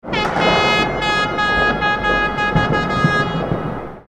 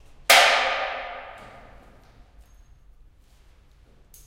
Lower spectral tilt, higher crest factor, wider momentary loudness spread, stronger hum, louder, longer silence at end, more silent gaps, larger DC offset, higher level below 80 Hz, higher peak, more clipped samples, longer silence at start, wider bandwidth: first, -5 dB/octave vs 1 dB/octave; second, 16 dB vs 24 dB; second, 6 LU vs 24 LU; neither; about the same, -17 LUFS vs -18 LUFS; second, 0.1 s vs 2.8 s; neither; neither; first, -34 dBFS vs -52 dBFS; about the same, -2 dBFS vs -2 dBFS; neither; second, 0.05 s vs 0.3 s; second, 13 kHz vs 16 kHz